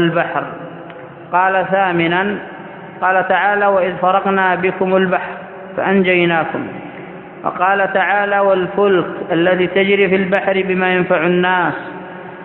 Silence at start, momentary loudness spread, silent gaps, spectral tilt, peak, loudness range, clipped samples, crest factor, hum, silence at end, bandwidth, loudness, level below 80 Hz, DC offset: 0 s; 17 LU; none; -9.5 dB/octave; 0 dBFS; 3 LU; under 0.1%; 16 dB; none; 0 s; 4.2 kHz; -15 LUFS; -56 dBFS; under 0.1%